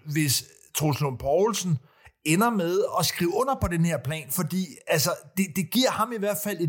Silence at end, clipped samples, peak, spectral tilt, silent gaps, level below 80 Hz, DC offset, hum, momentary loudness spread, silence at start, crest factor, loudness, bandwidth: 0 s; under 0.1%; -8 dBFS; -4.5 dB/octave; none; -50 dBFS; under 0.1%; none; 6 LU; 0.05 s; 18 dB; -25 LUFS; 17 kHz